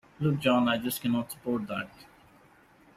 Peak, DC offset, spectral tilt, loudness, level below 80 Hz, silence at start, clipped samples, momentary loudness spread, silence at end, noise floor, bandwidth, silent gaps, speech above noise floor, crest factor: -12 dBFS; under 0.1%; -5.5 dB/octave; -29 LUFS; -64 dBFS; 0.2 s; under 0.1%; 11 LU; 0.95 s; -59 dBFS; 16 kHz; none; 30 dB; 18 dB